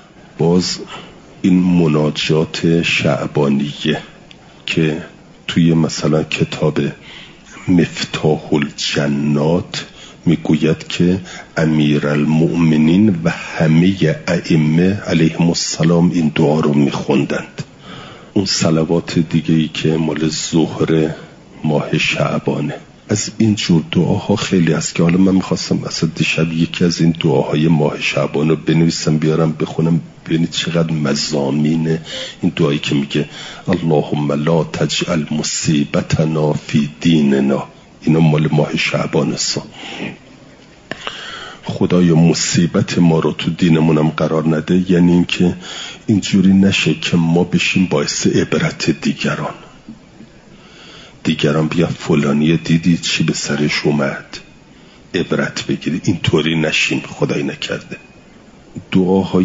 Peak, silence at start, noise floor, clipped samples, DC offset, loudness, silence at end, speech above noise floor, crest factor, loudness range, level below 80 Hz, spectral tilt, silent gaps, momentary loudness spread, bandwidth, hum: -2 dBFS; 0.4 s; -42 dBFS; under 0.1%; under 0.1%; -15 LUFS; 0 s; 28 dB; 14 dB; 4 LU; -48 dBFS; -5.5 dB/octave; none; 11 LU; 7.8 kHz; none